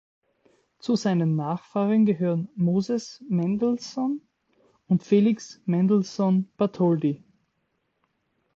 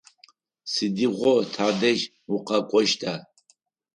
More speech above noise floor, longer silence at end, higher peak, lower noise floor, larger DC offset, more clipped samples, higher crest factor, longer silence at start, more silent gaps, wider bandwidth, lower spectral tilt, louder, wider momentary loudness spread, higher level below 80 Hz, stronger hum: first, 51 dB vs 42 dB; first, 1.4 s vs 0.75 s; about the same, -8 dBFS vs -6 dBFS; first, -74 dBFS vs -65 dBFS; neither; neither; about the same, 16 dB vs 18 dB; first, 0.85 s vs 0.65 s; neither; second, 7.6 kHz vs 11 kHz; first, -8 dB/octave vs -4 dB/octave; about the same, -25 LUFS vs -24 LUFS; about the same, 8 LU vs 10 LU; about the same, -68 dBFS vs -72 dBFS; neither